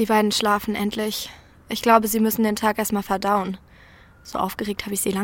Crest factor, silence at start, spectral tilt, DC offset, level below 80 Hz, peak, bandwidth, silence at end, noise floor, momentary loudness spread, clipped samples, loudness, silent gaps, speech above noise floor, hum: 20 dB; 0 s; -4 dB/octave; under 0.1%; -52 dBFS; -2 dBFS; 17 kHz; 0 s; -49 dBFS; 13 LU; under 0.1%; -22 LUFS; none; 27 dB; none